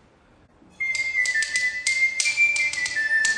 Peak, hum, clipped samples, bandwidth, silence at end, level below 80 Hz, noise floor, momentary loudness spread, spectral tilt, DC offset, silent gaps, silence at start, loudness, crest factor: -4 dBFS; none; under 0.1%; 10.5 kHz; 0 s; -62 dBFS; -56 dBFS; 5 LU; 2 dB/octave; under 0.1%; none; 0.8 s; -21 LUFS; 20 dB